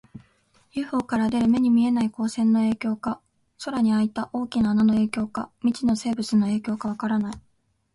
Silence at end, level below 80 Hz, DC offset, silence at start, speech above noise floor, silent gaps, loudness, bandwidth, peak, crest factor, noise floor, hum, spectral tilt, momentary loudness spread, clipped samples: 0.55 s; -56 dBFS; under 0.1%; 0.15 s; 40 dB; none; -24 LUFS; 11.5 kHz; -10 dBFS; 14 dB; -62 dBFS; none; -6.5 dB/octave; 11 LU; under 0.1%